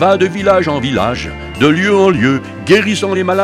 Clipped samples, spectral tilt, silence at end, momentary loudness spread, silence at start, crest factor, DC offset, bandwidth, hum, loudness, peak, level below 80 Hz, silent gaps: under 0.1%; -5.5 dB/octave; 0 s; 7 LU; 0 s; 12 dB; under 0.1%; 13 kHz; none; -12 LUFS; 0 dBFS; -38 dBFS; none